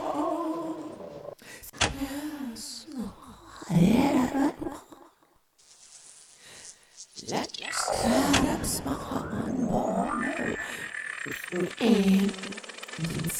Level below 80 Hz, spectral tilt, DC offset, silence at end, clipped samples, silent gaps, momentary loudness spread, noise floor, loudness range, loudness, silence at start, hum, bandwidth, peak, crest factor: -50 dBFS; -4.5 dB/octave; under 0.1%; 0 s; under 0.1%; none; 22 LU; -64 dBFS; 7 LU; -28 LUFS; 0 s; none; 16.5 kHz; -8 dBFS; 20 dB